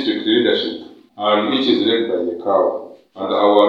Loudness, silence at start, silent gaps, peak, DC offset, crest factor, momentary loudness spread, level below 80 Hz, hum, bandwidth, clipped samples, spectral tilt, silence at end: -17 LUFS; 0 s; none; 0 dBFS; under 0.1%; 18 dB; 13 LU; -70 dBFS; none; 6.8 kHz; under 0.1%; -6 dB/octave; 0 s